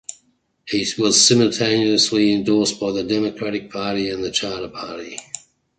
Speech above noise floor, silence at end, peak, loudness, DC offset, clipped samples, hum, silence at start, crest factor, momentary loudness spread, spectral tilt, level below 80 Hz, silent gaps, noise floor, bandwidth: 44 dB; 0.4 s; -2 dBFS; -18 LUFS; under 0.1%; under 0.1%; none; 0.1 s; 18 dB; 18 LU; -3 dB/octave; -56 dBFS; none; -63 dBFS; 9.4 kHz